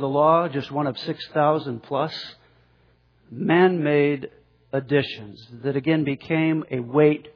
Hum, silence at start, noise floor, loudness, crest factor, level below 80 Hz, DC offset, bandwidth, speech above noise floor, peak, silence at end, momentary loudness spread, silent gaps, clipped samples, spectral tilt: none; 0 s; -60 dBFS; -22 LUFS; 18 dB; -66 dBFS; under 0.1%; 5.4 kHz; 38 dB; -4 dBFS; 0.05 s; 13 LU; none; under 0.1%; -8.5 dB/octave